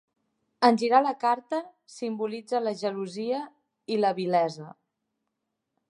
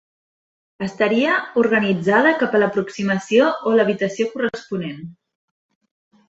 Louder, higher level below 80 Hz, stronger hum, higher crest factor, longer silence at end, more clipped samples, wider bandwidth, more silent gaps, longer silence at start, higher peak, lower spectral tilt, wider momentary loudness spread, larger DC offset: second, -27 LUFS vs -18 LUFS; second, -84 dBFS vs -62 dBFS; neither; first, 24 dB vs 18 dB; about the same, 1.15 s vs 1.15 s; neither; first, 11 kHz vs 8 kHz; neither; second, 0.6 s vs 0.8 s; about the same, -4 dBFS vs -2 dBFS; about the same, -5.5 dB/octave vs -6 dB/octave; first, 19 LU vs 13 LU; neither